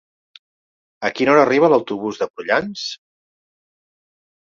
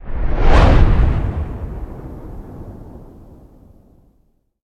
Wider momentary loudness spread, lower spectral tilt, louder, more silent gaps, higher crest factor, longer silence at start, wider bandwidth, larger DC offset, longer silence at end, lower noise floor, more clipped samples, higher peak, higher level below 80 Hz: second, 14 LU vs 23 LU; second, -5 dB/octave vs -7.5 dB/octave; about the same, -18 LUFS vs -17 LUFS; first, 2.30-2.34 s vs none; about the same, 20 dB vs 16 dB; first, 1 s vs 0.05 s; about the same, 7.4 kHz vs 7 kHz; neither; about the same, 1.65 s vs 1.65 s; first, under -90 dBFS vs -59 dBFS; neither; about the same, -2 dBFS vs 0 dBFS; second, -64 dBFS vs -18 dBFS